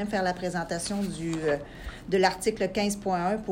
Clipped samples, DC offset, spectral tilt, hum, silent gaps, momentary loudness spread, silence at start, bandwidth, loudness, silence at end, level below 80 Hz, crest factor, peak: under 0.1%; under 0.1%; -4.5 dB/octave; none; none; 6 LU; 0 s; 16 kHz; -28 LUFS; 0 s; -48 dBFS; 20 dB; -8 dBFS